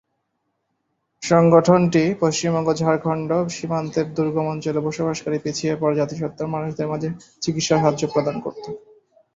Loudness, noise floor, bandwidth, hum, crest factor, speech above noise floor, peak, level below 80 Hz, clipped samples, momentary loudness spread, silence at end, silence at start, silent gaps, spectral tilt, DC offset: -21 LUFS; -74 dBFS; 7.8 kHz; none; 20 dB; 54 dB; -2 dBFS; -58 dBFS; under 0.1%; 11 LU; 0.55 s; 1.2 s; none; -6 dB/octave; under 0.1%